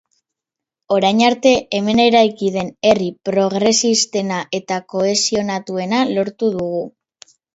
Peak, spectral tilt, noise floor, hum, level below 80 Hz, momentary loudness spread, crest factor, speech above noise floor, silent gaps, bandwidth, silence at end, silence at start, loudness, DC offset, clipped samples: 0 dBFS; -3.5 dB/octave; -85 dBFS; none; -56 dBFS; 10 LU; 18 dB; 69 dB; none; 8 kHz; 0.65 s; 0.9 s; -17 LUFS; under 0.1%; under 0.1%